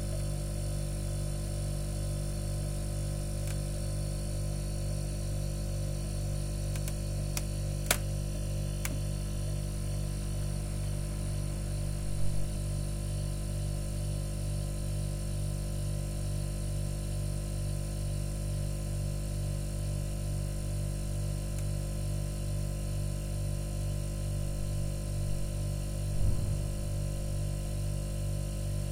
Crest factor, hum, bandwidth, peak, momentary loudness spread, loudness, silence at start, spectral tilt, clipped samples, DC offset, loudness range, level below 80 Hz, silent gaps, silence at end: 24 dB; 50 Hz at -40 dBFS; 16 kHz; -8 dBFS; 1 LU; -35 LUFS; 0 s; -5.5 dB/octave; under 0.1%; under 0.1%; 1 LU; -36 dBFS; none; 0 s